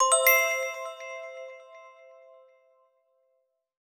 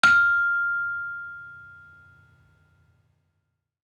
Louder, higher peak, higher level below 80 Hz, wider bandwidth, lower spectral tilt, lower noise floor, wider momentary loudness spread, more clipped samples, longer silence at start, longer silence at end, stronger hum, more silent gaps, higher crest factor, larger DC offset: about the same, -23 LUFS vs -22 LUFS; second, -6 dBFS vs -2 dBFS; second, under -90 dBFS vs -70 dBFS; first, over 20 kHz vs 11.5 kHz; second, 6.5 dB/octave vs -1.5 dB/octave; about the same, -75 dBFS vs -77 dBFS; about the same, 25 LU vs 24 LU; neither; about the same, 0 s vs 0.05 s; second, 1.9 s vs 2.15 s; neither; neither; about the same, 24 dB vs 24 dB; neither